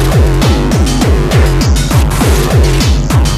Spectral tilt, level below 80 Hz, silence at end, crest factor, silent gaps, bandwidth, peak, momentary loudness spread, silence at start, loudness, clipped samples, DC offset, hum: -5.5 dB/octave; -12 dBFS; 0 s; 8 dB; none; 15.5 kHz; 0 dBFS; 2 LU; 0 s; -10 LUFS; under 0.1%; under 0.1%; none